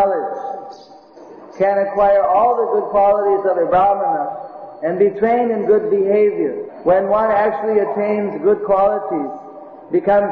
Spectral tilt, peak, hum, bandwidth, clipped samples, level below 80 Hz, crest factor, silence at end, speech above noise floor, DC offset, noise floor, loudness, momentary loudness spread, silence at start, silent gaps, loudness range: -9 dB/octave; -4 dBFS; none; 5.2 kHz; under 0.1%; -52 dBFS; 12 dB; 0 s; 26 dB; under 0.1%; -41 dBFS; -16 LUFS; 12 LU; 0 s; none; 2 LU